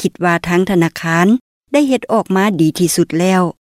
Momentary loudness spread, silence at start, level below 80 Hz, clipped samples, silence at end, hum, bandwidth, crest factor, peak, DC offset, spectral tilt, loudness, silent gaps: 3 LU; 0 s; -50 dBFS; under 0.1%; 0.2 s; none; 15.5 kHz; 12 dB; -2 dBFS; under 0.1%; -5.5 dB/octave; -14 LUFS; 1.41-1.61 s